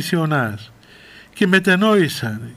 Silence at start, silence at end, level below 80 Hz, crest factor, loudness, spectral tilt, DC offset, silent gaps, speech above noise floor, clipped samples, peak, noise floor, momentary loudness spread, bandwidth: 0 s; 0 s; -60 dBFS; 16 dB; -17 LUFS; -5.5 dB/octave; under 0.1%; none; 27 dB; under 0.1%; -2 dBFS; -44 dBFS; 11 LU; 16 kHz